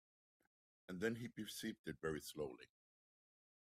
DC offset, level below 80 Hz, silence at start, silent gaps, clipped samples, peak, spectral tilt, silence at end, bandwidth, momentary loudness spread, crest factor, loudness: under 0.1%; -76 dBFS; 0.9 s; 1.79-1.84 s; under 0.1%; -28 dBFS; -4.5 dB/octave; 0.95 s; 15.5 kHz; 11 LU; 22 dB; -47 LUFS